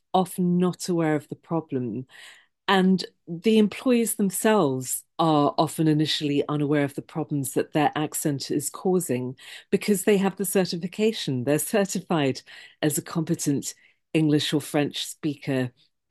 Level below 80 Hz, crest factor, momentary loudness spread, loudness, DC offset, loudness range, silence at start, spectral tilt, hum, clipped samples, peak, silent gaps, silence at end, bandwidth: -70 dBFS; 20 dB; 9 LU; -25 LUFS; under 0.1%; 3 LU; 0.15 s; -5 dB/octave; none; under 0.1%; -4 dBFS; none; 0.4 s; 12.5 kHz